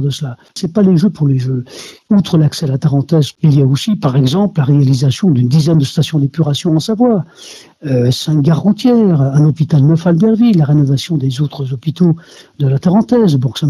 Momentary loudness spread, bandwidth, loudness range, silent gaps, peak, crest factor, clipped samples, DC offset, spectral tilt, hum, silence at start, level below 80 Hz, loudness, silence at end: 8 LU; 13 kHz; 3 LU; none; 0 dBFS; 12 dB; under 0.1%; under 0.1%; -7.5 dB/octave; none; 0 s; -50 dBFS; -12 LUFS; 0 s